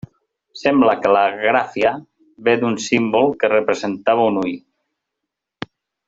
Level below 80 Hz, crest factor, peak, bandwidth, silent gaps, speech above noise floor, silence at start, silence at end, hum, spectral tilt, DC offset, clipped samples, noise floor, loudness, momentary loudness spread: -60 dBFS; 16 dB; -2 dBFS; 8 kHz; none; 64 dB; 0.55 s; 1.5 s; none; -5 dB/octave; under 0.1%; under 0.1%; -81 dBFS; -17 LUFS; 18 LU